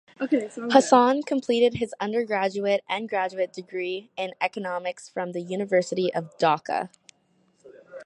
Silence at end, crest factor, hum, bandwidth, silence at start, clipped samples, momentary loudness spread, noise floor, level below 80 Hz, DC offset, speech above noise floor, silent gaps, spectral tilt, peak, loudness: 0 s; 24 dB; none; 11 kHz; 0.2 s; under 0.1%; 12 LU; -66 dBFS; -66 dBFS; under 0.1%; 41 dB; none; -4.5 dB/octave; -2 dBFS; -25 LUFS